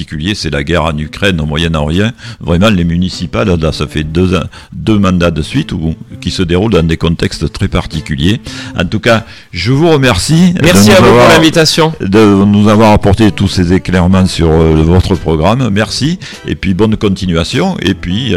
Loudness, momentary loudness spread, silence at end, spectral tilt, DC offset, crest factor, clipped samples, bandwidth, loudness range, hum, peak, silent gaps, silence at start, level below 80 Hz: -10 LUFS; 10 LU; 0 s; -5.5 dB/octave; under 0.1%; 10 dB; under 0.1%; 16.5 kHz; 7 LU; none; 0 dBFS; none; 0 s; -24 dBFS